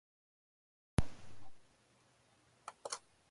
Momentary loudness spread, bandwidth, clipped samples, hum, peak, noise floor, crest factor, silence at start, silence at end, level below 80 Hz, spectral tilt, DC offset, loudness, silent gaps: 21 LU; 11.5 kHz; under 0.1%; none; -16 dBFS; -71 dBFS; 28 dB; 1 s; 0.35 s; -52 dBFS; -5 dB/octave; under 0.1%; -44 LUFS; none